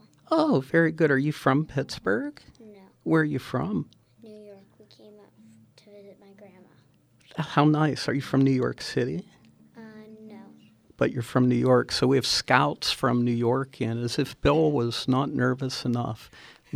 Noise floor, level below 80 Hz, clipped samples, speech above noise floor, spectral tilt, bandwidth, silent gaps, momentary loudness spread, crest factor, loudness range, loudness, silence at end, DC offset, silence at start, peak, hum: -60 dBFS; -54 dBFS; under 0.1%; 36 dB; -6 dB/octave; 14.5 kHz; none; 15 LU; 24 dB; 8 LU; -25 LUFS; 0.5 s; under 0.1%; 0.3 s; -2 dBFS; none